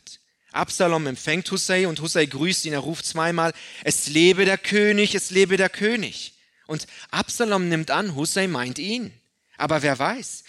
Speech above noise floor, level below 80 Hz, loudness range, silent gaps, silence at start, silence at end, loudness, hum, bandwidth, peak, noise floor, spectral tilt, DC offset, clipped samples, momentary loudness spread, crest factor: 26 dB; -64 dBFS; 5 LU; none; 0.05 s; 0.1 s; -22 LUFS; none; 13 kHz; -6 dBFS; -48 dBFS; -3.5 dB/octave; under 0.1%; under 0.1%; 11 LU; 18 dB